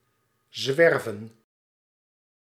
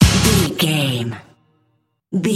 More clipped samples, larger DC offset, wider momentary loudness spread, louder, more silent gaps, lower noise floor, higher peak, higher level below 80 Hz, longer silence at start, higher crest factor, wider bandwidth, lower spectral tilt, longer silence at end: neither; neither; first, 20 LU vs 14 LU; second, -23 LUFS vs -17 LUFS; neither; first, -71 dBFS vs -65 dBFS; second, -6 dBFS vs 0 dBFS; second, -82 dBFS vs -30 dBFS; first, 0.55 s vs 0 s; about the same, 22 dB vs 18 dB; about the same, 15 kHz vs 16.5 kHz; about the same, -4.5 dB/octave vs -4.5 dB/octave; first, 1.2 s vs 0 s